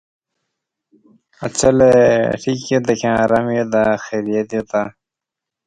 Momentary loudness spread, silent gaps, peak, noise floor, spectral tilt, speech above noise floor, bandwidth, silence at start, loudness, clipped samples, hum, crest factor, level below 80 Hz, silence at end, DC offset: 11 LU; none; 0 dBFS; -84 dBFS; -5.5 dB/octave; 69 dB; 10.5 kHz; 1.4 s; -16 LUFS; under 0.1%; none; 18 dB; -48 dBFS; 0.75 s; under 0.1%